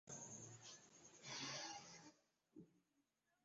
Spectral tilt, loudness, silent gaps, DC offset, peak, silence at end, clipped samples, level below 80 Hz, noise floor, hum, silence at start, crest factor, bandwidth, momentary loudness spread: -2 dB/octave; -54 LUFS; none; under 0.1%; -38 dBFS; 0.45 s; under 0.1%; under -90 dBFS; -87 dBFS; none; 0.05 s; 20 dB; 7.6 kHz; 18 LU